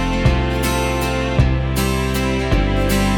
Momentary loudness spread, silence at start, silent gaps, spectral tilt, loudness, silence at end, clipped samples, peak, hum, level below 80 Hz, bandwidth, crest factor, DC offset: 2 LU; 0 s; none; -5.5 dB/octave; -18 LUFS; 0 s; under 0.1%; -2 dBFS; none; -22 dBFS; 18.5 kHz; 14 dB; under 0.1%